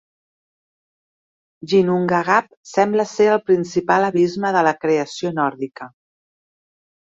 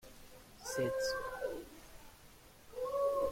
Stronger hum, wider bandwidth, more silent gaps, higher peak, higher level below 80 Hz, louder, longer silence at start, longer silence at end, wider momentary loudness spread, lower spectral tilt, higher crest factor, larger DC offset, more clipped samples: neither; second, 7.8 kHz vs 16.5 kHz; first, 2.57-2.63 s vs none; first, -2 dBFS vs -24 dBFS; about the same, -64 dBFS vs -62 dBFS; first, -18 LUFS vs -39 LUFS; first, 1.65 s vs 0.05 s; first, 1.15 s vs 0 s; second, 8 LU vs 23 LU; first, -6 dB/octave vs -3.5 dB/octave; about the same, 18 dB vs 16 dB; neither; neither